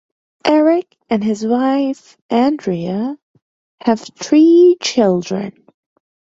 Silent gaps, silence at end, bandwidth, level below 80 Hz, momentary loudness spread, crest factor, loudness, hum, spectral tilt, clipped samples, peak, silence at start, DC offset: 2.21-2.29 s, 3.22-3.34 s, 3.42-3.78 s; 0.85 s; 7.8 kHz; -60 dBFS; 13 LU; 14 dB; -15 LUFS; none; -5.5 dB/octave; under 0.1%; -2 dBFS; 0.45 s; under 0.1%